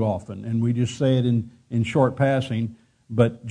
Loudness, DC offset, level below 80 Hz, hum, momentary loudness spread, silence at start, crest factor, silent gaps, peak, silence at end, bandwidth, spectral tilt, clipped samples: -23 LUFS; under 0.1%; -56 dBFS; none; 9 LU; 0 s; 18 dB; none; -4 dBFS; 0 s; 10 kHz; -7.5 dB/octave; under 0.1%